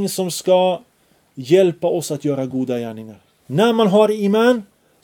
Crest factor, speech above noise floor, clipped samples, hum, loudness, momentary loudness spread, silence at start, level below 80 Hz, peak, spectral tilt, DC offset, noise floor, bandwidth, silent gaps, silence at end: 18 dB; 41 dB; under 0.1%; none; -17 LUFS; 11 LU; 0 s; -68 dBFS; 0 dBFS; -5.5 dB/octave; under 0.1%; -58 dBFS; 18.5 kHz; none; 0.4 s